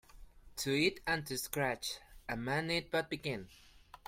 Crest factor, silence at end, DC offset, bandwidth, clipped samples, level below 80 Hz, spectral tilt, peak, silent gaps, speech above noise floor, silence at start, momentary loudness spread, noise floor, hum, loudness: 20 dB; 0.1 s; under 0.1%; 16.5 kHz; under 0.1%; -60 dBFS; -4 dB/octave; -18 dBFS; none; 19 dB; 0.15 s; 13 LU; -55 dBFS; none; -36 LUFS